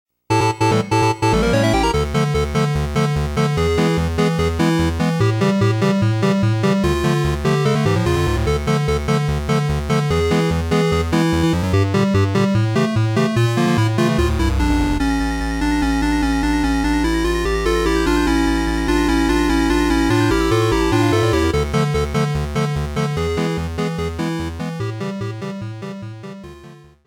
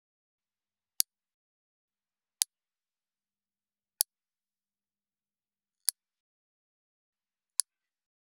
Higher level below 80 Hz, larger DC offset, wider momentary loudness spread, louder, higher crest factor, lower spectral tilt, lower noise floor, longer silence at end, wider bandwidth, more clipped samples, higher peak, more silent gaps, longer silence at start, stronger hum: first, -28 dBFS vs -88 dBFS; neither; first, 6 LU vs 1 LU; first, -18 LUFS vs -33 LUFS; second, 12 dB vs 42 dB; first, -6 dB/octave vs 4 dB/octave; second, -42 dBFS vs under -90 dBFS; second, 0.3 s vs 5.9 s; first, 17.5 kHz vs 10 kHz; neither; second, -6 dBFS vs -2 dBFS; neither; second, 0.3 s vs 2.4 s; neither